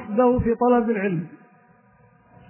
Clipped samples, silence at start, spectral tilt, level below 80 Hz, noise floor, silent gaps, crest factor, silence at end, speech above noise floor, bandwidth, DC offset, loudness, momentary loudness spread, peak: under 0.1%; 0 s; -12 dB/octave; -44 dBFS; -56 dBFS; none; 16 dB; 1.15 s; 36 dB; 3.1 kHz; under 0.1%; -21 LUFS; 10 LU; -6 dBFS